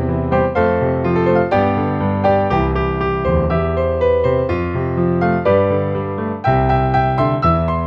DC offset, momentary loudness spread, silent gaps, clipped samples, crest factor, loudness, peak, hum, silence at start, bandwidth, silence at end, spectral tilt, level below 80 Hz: under 0.1%; 4 LU; none; under 0.1%; 14 dB; -16 LUFS; -2 dBFS; none; 0 s; 6 kHz; 0 s; -9.5 dB/octave; -30 dBFS